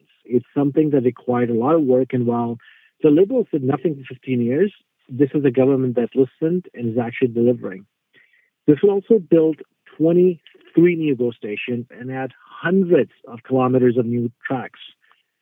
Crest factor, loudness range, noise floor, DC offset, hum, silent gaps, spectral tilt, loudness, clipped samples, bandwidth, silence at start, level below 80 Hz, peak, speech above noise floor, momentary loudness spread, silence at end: 18 dB; 3 LU; -58 dBFS; under 0.1%; none; none; -11 dB/octave; -19 LUFS; under 0.1%; 16.5 kHz; 0.3 s; -68 dBFS; 0 dBFS; 39 dB; 12 LU; 0.55 s